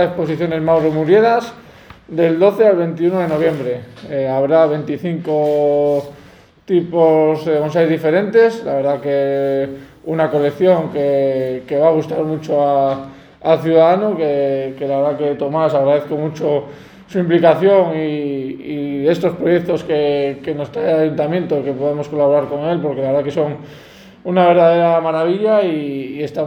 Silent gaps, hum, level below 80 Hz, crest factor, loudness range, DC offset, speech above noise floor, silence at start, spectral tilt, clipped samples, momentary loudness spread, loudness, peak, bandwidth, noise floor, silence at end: none; none; -56 dBFS; 16 dB; 2 LU; under 0.1%; 29 dB; 0 s; -8 dB/octave; under 0.1%; 11 LU; -16 LUFS; 0 dBFS; 19 kHz; -44 dBFS; 0 s